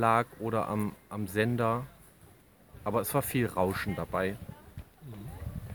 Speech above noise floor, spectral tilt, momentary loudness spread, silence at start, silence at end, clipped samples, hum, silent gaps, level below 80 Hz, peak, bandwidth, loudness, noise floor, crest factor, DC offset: 27 dB; -6 dB/octave; 18 LU; 0 s; 0 s; under 0.1%; none; none; -54 dBFS; -10 dBFS; over 20 kHz; -32 LUFS; -58 dBFS; 22 dB; under 0.1%